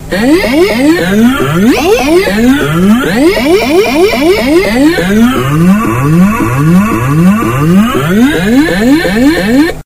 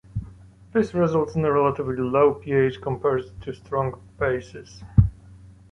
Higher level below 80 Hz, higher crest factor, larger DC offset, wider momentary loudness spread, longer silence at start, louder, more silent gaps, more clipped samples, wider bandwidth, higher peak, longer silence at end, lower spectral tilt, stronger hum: first, -26 dBFS vs -38 dBFS; second, 6 dB vs 20 dB; first, 0.3% vs under 0.1%; second, 1 LU vs 15 LU; second, 0 s vs 0.15 s; first, -7 LUFS vs -23 LUFS; neither; first, 0.8% vs under 0.1%; first, 16.5 kHz vs 7.6 kHz; about the same, 0 dBFS vs -2 dBFS; second, 0.05 s vs 0.25 s; second, -6 dB/octave vs -8.5 dB/octave; neither